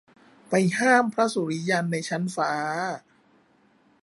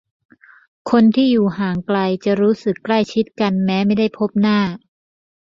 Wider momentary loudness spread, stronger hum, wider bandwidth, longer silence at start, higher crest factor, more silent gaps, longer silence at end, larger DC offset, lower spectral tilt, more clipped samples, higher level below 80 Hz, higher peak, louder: about the same, 9 LU vs 7 LU; neither; first, 11.5 kHz vs 7.4 kHz; second, 0.5 s vs 0.85 s; about the same, 20 dB vs 16 dB; neither; first, 1.05 s vs 0.65 s; neither; second, -5 dB/octave vs -7.5 dB/octave; neither; second, -74 dBFS vs -56 dBFS; second, -6 dBFS vs -2 dBFS; second, -24 LUFS vs -17 LUFS